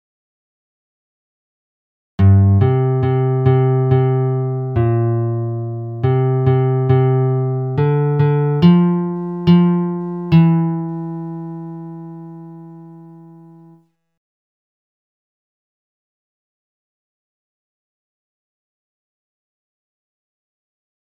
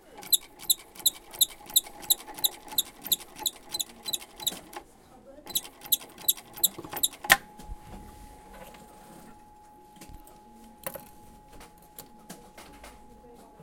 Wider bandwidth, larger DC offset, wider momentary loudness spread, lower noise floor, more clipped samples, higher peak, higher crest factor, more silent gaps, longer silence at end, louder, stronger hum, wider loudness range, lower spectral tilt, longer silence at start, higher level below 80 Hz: second, 5 kHz vs 17 kHz; neither; second, 17 LU vs 25 LU; about the same, -51 dBFS vs -53 dBFS; neither; about the same, 0 dBFS vs -2 dBFS; second, 18 dB vs 32 dB; neither; first, 8.05 s vs 0 s; first, -16 LUFS vs -27 LUFS; neither; second, 11 LU vs 20 LU; first, -11.5 dB/octave vs 0.5 dB/octave; first, 2.2 s vs 0.1 s; first, -50 dBFS vs -56 dBFS